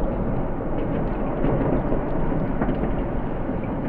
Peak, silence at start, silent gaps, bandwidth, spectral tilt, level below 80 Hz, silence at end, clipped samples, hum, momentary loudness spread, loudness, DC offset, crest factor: -8 dBFS; 0 s; none; 3.6 kHz; -11.5 dB/octave; -28 dBFS; 0 s; under 0.1%; none; 5 LU; -26 LUFS; under 0.1%; 16 dB